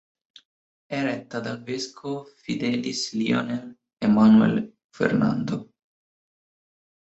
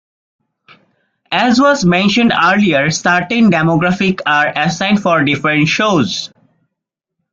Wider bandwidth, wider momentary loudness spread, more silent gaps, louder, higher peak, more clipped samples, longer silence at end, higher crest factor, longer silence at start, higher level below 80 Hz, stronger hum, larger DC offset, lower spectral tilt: about the same, 8 kHz vs 7.6 kHz; first, 16 LU vs 4 LU; first, 4.84-4.89 s vs none; second, -24 LUFS vs -12 LUFS; second, -6 dBFS vs 0 dBFS; neither; first, 1.35 s vs 1.05 s; first, 20 dB vs 14 dB; second, 0.9 s vs 1.3 s; second, -62 dBFS vs -50 dBFS; neither; neither; about the same, -6 dB/octave vs -5 dB/octave